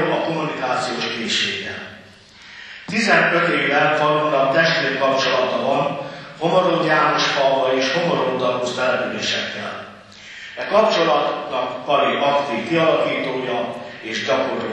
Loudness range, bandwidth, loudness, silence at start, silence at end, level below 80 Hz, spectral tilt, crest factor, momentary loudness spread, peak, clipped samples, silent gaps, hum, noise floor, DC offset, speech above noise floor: 4 LU; 9.6 kHz; -19 LUFS; 0 s; 0 s; -64 dBFS; -4 dB/octave; 16 dB; 14 LU; -2 dBFS; under 0.1%; none; none; -44 dBFS; under 0.1%; 26 dB